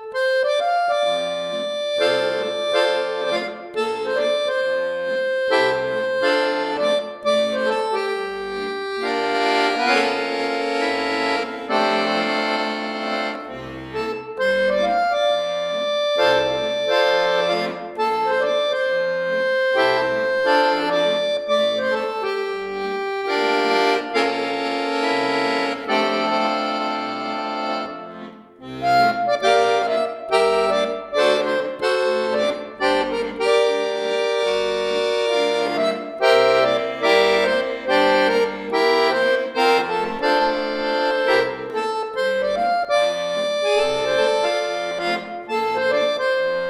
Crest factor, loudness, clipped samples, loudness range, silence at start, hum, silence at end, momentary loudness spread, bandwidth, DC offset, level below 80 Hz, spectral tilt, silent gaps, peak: 18 dB; -20 LUFS; under 0.1%; 4 LU; 0 s; none; 0 s; 7 LU; 14 kHz; under 0.1%; -58 dBFS; -3.5 dB/octave; none; -2 dBFS